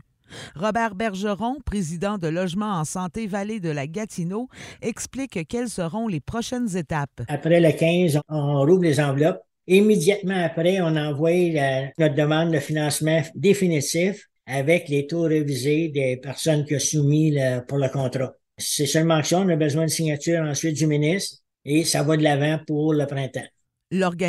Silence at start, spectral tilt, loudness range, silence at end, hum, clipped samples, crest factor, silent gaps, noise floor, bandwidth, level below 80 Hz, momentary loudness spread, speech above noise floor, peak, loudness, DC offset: 0.3 s; -5.5 dB/octave; 8 LU; 0 s; none; under 0.1%; 18 dB; none; -42 dBFS; 13 kHz; -52 dBFS; 10 LU; 21 dB; -4 dBFS; -22 LUFS; under 0.1%